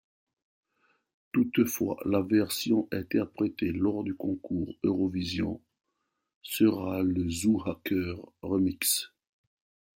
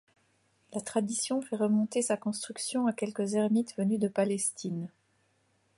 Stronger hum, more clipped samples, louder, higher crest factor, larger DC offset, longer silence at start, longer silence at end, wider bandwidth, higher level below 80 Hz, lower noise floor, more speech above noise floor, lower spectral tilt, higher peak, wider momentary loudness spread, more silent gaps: neither; neither; about the same, -29 LUFS vs -31 LUFS; about the same, 18 dB vs 16 dB; neither; first, 1.35 s vs 0.7 s; about the same, 0.9 s vs 0.9 s; first, 16.5 kHz vs 11.5 kHz; first, -62 dBFS vs -76 dBFS; first, -81 dBFS vs -71 dBFS; first, 53 dB vs 41 dB; about the same, -5 dB/octave vs -5 dB/octave; about the same, -12 dBFS vs -14 dBFS; about the same, 8 LU vs 9 LU; first, 6.35-6.41 s vs none